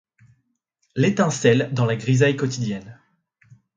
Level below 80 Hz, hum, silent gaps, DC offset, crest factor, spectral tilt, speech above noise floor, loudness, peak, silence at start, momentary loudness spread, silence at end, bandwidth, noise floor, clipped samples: -60 dBFS; none; none; under 0.1%; 20 dB; -6 dB/octave; 52 dB; -20 LUFS; -2 dBFS; 0.95 s; 10 LU; 0.85 s; 9.2 kHz; -72 dBFS; under 0.1%